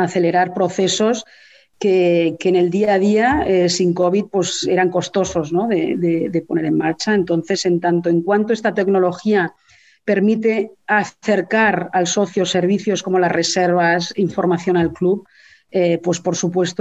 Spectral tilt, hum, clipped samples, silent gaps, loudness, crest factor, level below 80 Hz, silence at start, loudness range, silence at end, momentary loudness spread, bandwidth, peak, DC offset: -5 dB/octave; none; under 0.1%; none; -17 LUFS; 16 dB; -50 dBFS; 0 s; 2 LU; 0.1 s; 4 LU; 8.4 kHz; -2 dBFS; under 0.1%